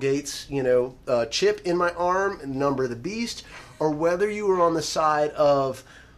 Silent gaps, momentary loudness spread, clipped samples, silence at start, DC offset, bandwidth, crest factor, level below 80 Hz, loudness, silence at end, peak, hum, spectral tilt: none; 8 LU; under 0.1%; 0 s; under 0.1%; 14.5 kHz; 16 dB; -52 dBFS; -24 LUFS; 0.15 s; -8 dBFS; none; -4.5 dB/octave